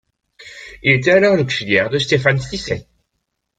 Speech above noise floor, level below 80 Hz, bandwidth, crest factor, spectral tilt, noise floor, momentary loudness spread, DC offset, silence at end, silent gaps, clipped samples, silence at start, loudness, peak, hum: 58 dB; -46 dBFS; 9.2 kHz; 18 dB; -5.5 dB/octave; -74 dBFS; 14 LU; under 0.1%; 0.75 s; none; under 0.1%; 0.4 s; -16 LUFS; 0 dBFS; none